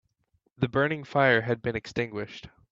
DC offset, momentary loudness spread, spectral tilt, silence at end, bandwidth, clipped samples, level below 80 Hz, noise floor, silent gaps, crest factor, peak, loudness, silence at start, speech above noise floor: under 0.1%; 15 LU; -7 dB/octave; 0.25 s; 7.6 kHz; under 0.1%; -58 dBFS; -72 dBFS; none; 20 dB; -8 dBFS; -27 LUFS; 0.6 s; 45 dB